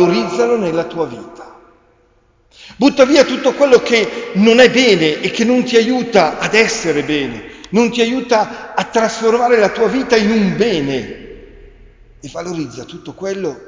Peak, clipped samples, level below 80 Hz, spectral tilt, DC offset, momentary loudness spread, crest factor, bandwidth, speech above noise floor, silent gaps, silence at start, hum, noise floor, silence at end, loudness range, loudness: 0 dBFS; under 0.1%; -48 dBFS; -4.5 dB/octave; under 0.1%; 15 LU; 14 dB; 7.6 kHz; 40 dB; none; 0 s; none; -54 dBFS; 0 s; 6 LU; -14 LUFS